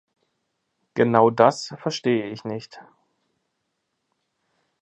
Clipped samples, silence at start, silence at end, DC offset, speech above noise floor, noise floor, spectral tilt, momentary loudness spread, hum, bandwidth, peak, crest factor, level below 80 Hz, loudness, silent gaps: under 0.1%; 0.95 s; 2 s; under 0.1%; 56 dB; -77 dBFS; -6 dB/octave; 15 LU; none; 8.6 kHz; -2 dBFS; 24 dB; -68 dBFS; -21 LUFS; none